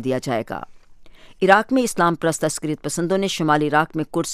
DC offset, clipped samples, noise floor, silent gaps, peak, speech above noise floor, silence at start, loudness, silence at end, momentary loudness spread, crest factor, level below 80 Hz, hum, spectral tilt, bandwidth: under 0.1%; under 0.1%; -43 dBFS; none; 0 dBFS; 23 dB; 0 s; -20 LUFS; 0 s; 9 LU; 20 dB; -52 dBFS; none; -4.5 dB/octave; 15.5 kHz